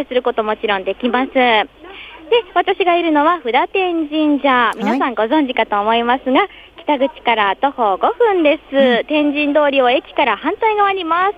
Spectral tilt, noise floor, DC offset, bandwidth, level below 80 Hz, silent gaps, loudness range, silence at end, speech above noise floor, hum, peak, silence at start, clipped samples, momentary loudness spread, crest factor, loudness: -5.5 dB/octave; -35 dBFS; under 0.1%; 10.5 kHz; -52 dBFS; none; 2 LU; 0.05 s; 20 dB; none; 0 dBFS; 0 s; under 0.1%; 5 LU; 14 dB; -15 LUFS